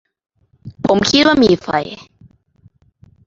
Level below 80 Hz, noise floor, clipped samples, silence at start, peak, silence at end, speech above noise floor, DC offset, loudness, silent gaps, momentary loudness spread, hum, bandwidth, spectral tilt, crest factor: -46 dBFS; -52 dBFS; under 0.1%; 0.65 s; 0 dBFS; 1.3 s; 39 dB; under 0.1%; -14 LUFS; none; 16 LU; none; 7.8 kHz; -4.5 dB/octave; 16 dB